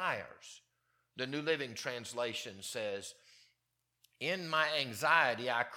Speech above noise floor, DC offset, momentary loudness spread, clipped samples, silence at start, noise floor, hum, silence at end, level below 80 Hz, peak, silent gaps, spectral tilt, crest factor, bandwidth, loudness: 48 dB; under 0.1%; 19 LU; under 0.1%; 0 s; -84 dBFS; none; 0 s; -84 dBFS; -12 dBFS; none; -3 dB/octave; 24 dB; 18 kHz; -35 LUFS